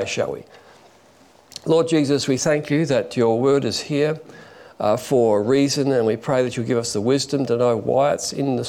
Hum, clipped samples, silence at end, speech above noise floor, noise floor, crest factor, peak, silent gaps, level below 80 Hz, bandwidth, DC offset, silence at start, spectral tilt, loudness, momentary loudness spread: none; under 0.1%; 0 s; 32 dB; -52 dBFS; 14 dB; -6 dBFS; none; -60 dBFS; 16.5 kHz; under 0.1%; 0 s; -5 dB/octave; -20 LUFS; 6 LU